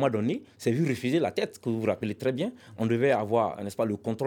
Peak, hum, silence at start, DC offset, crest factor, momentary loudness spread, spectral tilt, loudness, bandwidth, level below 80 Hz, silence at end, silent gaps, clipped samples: -12 dBFS; none; 0 s; under 0.1%; 16 dB; 7 LU; -7 dB/octave; -28 LUFS; 18.5 kHz; -70 dBFS; 0 s; none; under 0.1%